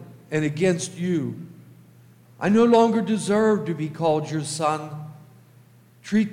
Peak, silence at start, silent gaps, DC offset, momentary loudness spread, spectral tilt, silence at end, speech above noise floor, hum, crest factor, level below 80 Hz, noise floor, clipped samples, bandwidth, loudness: -6 dBFS; 0 s; none; under 0.1%; 20 LU; -6 dB/octave; 0 s; 31 dB; none; 18 dB; -66 dBFS; -52 dBFS; under 0.1%; 12.5 kHz; -22 LUFS